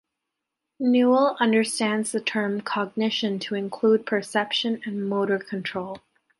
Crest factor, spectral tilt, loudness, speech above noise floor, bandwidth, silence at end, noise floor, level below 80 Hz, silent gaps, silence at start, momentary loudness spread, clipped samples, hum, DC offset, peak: 18 dB; -4.5 dB/octave; -24 LUFS; 60 dB; 11.5 kHz; 0.4 s; -83 dBFS; -74 dBFS; none; 0.8 s; 10 LU; under 0.1%; none; under 0.1%; -6 dBFS